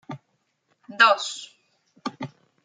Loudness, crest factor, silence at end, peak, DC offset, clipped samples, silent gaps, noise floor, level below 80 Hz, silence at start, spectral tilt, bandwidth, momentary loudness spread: -21 LUFS; 24 dB; 0.35 s; -2 dBFS; under 0.1%; under 0.1%; none; -72 dBFS; -84 dBFS; 0.1 s; -2.5 dB/octave; 9.6 kHz; 25 LU